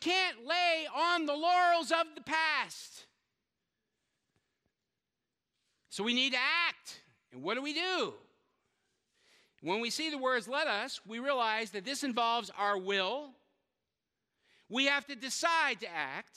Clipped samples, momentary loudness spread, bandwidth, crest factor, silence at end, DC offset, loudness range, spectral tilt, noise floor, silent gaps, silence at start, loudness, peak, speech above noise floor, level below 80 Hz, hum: under 0.1%; 11 LU; 15.5 kHz; 20 dB; 0.15 s; under 0.1%; 6 LU; -2 dB/octave; -89 dBFS; none; 0 s; -32 LUFS; -14 dBFS; 56 dB; -88 dBFS; none